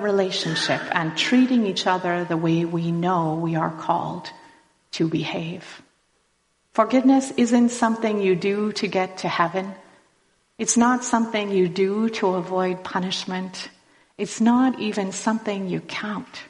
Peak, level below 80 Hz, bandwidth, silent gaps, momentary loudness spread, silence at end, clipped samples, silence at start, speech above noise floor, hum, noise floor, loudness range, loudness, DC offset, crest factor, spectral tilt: -4 dBFS; -66 dBFS; 11 kHz; none; 12 LU; 0 s; under 0.1%; 0 s; 46 dB; none; -68 dBFS; 4 LU; -22 LUFS; under 0.1%; 18 dB; -4.5 dB/octave